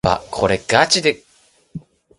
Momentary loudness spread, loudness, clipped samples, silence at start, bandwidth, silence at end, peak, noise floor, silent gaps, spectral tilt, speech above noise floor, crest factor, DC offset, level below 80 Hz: 23 LU; -16 LUFS; under 0.1%; 0.05 s; 11.5 kHz; 0.4 s; 0 dBFS; -56 dBFS; none; -3 dB/octave; 39 dB; 20 dB; under 0.1%; -42 dBFS